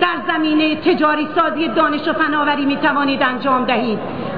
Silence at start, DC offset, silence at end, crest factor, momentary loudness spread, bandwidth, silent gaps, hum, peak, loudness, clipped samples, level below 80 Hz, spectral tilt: 0 s; 1%; 0 s; 12 dB; 2 LU; 5 kHz; none; none; -4 dBFS; -16 LUFS; under 0.1%; -54 dBFS; -7.5 dB/octave